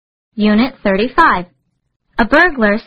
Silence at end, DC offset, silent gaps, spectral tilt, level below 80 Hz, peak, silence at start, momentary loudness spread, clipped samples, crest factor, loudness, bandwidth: 0.05 s; under 0.1%; 1.96-2.00 s; -7 dB/octave; -36 dBFS; 0 dBFS; 0.35 s; 9 LU; under 0.1%; 14 dB; -13 LUFS; 8 kHz